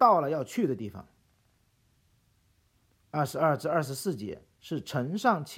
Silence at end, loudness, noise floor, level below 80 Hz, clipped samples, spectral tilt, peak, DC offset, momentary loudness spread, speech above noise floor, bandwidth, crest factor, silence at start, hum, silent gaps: 0 s; -30 LUFS; -69 dBFS; -70 dBFS; under 0.1%; -6 dB/octave; -8 dBFS; under 0.1%; 14 LU; 40 dB; 16.5 kHz; 22 dB; 0 s; none; none